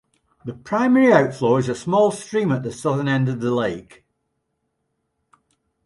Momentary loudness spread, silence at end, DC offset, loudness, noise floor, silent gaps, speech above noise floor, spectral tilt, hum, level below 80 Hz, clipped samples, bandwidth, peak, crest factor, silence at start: 15 LU; 2.05 s; under 0.1%; -19 LUFS; -74 dBFS; none; 55 dB; -7 dB/octave; none; -60 dBFS; under 0.1%; 11.5 kHz; -2 dBFS; 20 dB; 0.45 s